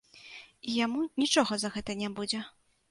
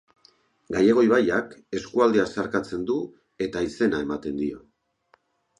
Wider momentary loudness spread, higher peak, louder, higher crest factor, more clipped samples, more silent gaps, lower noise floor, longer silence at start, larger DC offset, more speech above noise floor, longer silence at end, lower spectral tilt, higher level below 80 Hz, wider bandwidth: first, 21 LU vs 13 LU; second, -12 dBFS vs -6 dBFS; second, -30 LUFS vs -24 LUFS; about the same, 20 dB vs 20 dB; neither; neither; second, -51 dBFS vs -65 dBFS; second, 0.15 s vs 0.7 s; neither; second, 21 dB vs 41 dB; second, 0.4 s vs 1 s; second, -3 dB/octave vs -6 dB/octave; second, -66 dBFS vs -56 dBFS; about the same, 11.5 kHz vs 11 kHz